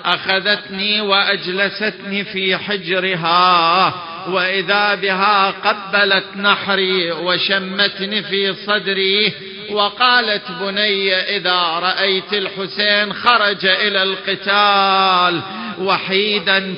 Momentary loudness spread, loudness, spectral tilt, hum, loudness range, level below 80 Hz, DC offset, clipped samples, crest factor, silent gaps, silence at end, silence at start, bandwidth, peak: 7 LU; -15 LUFS; -6.5 dB/octave; none; 2 LU; -62 dBFS; under 0.1%; under 0.1%; 16 dB; none; 0 s; 0 s; 5.6 kHz; 0 dBFS